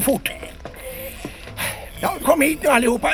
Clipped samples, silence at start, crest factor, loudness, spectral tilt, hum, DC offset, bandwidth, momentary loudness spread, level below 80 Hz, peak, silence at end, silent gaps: under 0.1%; 0 s; 20 dB; -20 LUFS; -3.5 dB/octave; none; 0.2%; over 20 kHz; 17 LU; -42 dBFS; 0 dBFS; 0 s; none